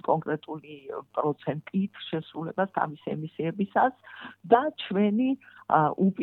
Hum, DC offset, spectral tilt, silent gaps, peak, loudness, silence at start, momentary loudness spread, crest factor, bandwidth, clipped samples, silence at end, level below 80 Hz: none; under 0.1%; -10 dB/octave; none; -6 dBFS; -28 LUFS; 0.05 s; 16 LU; 22 dB; 4.2 kHz; under 0.1%; 0 s; -74 dBFS